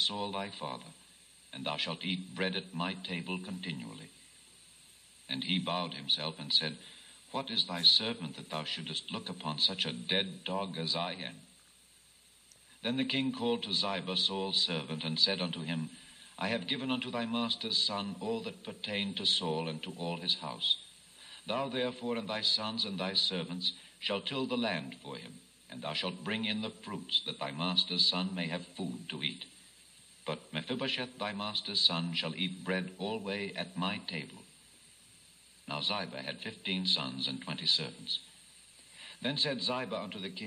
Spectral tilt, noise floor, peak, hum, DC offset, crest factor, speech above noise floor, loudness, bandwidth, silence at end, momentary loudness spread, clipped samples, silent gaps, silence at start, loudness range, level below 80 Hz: -4 dB/octave; -62 dBFS; -10 dBFS; none; under 0.1%; 26 dB; 28 dB; -33 LUFS; 14.5 kHz; 0 s; 13 LU; under 0.1%; none; 0 s; 7 LU; -76 dBFS